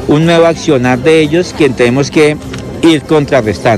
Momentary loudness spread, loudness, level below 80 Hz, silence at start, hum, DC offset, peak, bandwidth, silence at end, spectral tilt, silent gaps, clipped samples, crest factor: 4 LU; -9 LUFS; -36 dBFS; 0 s; none; 0.2%; 0 dBFS; 13 kHz; 0 s; -6 dB/octave; none; 0.4%; 8 dB